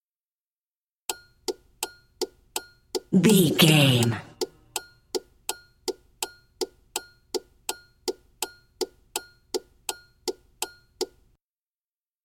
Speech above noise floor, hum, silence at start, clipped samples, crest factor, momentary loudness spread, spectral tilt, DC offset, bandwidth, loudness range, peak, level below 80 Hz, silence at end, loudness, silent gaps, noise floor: over 71 dB; none; 1.1 s; under 0.1%; 24 dB; 17 LU; -4.5 dB/octave; under 0.1%; 17 kHz; 13 LU; -4 dBFS; -62 dBFS; 1.2 s; -27 LUFS; none; under -90 dBFS